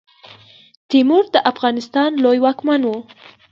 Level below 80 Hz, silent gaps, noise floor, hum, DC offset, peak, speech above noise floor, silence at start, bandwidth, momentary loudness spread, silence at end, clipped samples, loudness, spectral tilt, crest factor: -68 dBFS; none; -45 dBFS; none; under 0.1%; 0 dBFS; 29 dB; 0.9 s; 7.2 kHz; 6 LU; 0.5 s; under 0.1%; -16 LUFS; -5 dB/octave; 18 dB